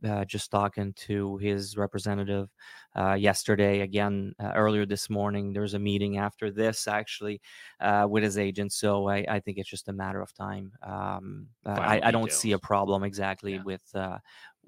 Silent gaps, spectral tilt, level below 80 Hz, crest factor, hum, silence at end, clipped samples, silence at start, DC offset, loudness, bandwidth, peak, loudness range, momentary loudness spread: none; -5 dB/octave; -64 dBFS; 22 dB; none; 0.2 s; under 0.1%; 0 s; under 0.1%; -29 LUFS; 16.5 kHz; -6 dBFS; 3 LU; 12 LU